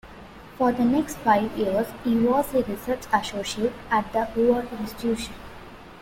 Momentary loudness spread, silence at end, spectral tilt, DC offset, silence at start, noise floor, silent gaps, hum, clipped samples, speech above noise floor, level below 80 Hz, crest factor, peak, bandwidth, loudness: 20 LU; 0 s; -5 dB/octave; under 0.1%; 0.05 s; -44 dBFS; none; none; under 0.1%; 20 dB; -48 dBFS; 18 dB; -8 dBFS; 16.5 kHz; -24 LUFS